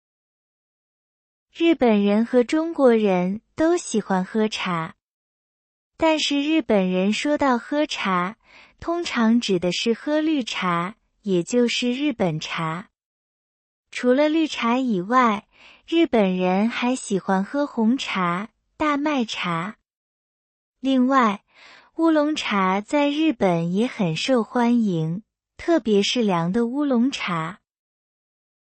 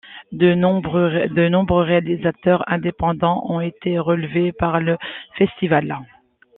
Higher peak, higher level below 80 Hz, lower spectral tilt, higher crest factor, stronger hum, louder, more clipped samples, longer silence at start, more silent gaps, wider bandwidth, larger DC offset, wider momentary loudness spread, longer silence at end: second, -6 dBFS vs -2 dBFS; second, -60 dBFS vs -46 dBFS; second, -5.5 dB/octave vs -10.5 dB/octave; about the same, 16 dB vs 18 dB; neither; second, -22 LUFS vs -19 LUFS; neither; first, 1.55 s vs 0.05 s; first, 5.03-5.91 s, 13.05-13.84 s, 19.94-20.73 s vs none; first, 8.8 kHz vs 4 kHz; neither; about the same, 9 LU vs 7 LU; first, 1.25 s vs 0.5 s